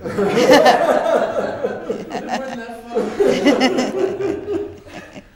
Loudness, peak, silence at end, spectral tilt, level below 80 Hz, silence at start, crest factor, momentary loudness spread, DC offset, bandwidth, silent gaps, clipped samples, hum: -17 LUFS; 0 dBFS; 0.15 s; -4.5 dB/octave; -50 dBFS; 0 s; 16 dB; 17 LU; under 0.1%; 17.5 kHz; none; under 0.1%; none